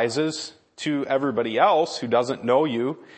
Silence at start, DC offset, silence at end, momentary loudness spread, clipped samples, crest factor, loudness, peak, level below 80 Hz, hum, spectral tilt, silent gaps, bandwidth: 0 s; under 0.1%; 0.15 s; 9 LU; under 0.1%; 18 dB; -23 LUFS; -6 dBFS; -72 dBFS; none; -5 dB/octave; none; 8.8 kHz